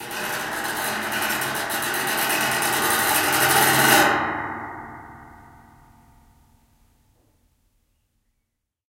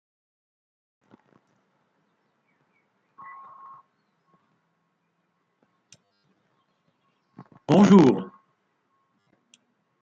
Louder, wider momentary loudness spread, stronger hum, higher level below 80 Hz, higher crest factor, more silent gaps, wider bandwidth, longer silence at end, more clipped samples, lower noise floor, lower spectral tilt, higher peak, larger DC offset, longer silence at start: about the same, -20 LUFS vs -18 LUFS; second, 16 LU vs 30 LU; neither; first, -56 dBFS vs -70 dBFS; about the same, 22 dB vs 24 dB; neither; first, 17 kHz vs 7.6 kHz; first, 3.5 s vs 1.75 s; neither; about the same, -77 dBFS vs -74 dBFS; second, -1.5 dB/octave vs -7.5 dB/octave; about the same, -2 dBFS vs -4 dBFS; neither; second, 0 s vs 7.7 s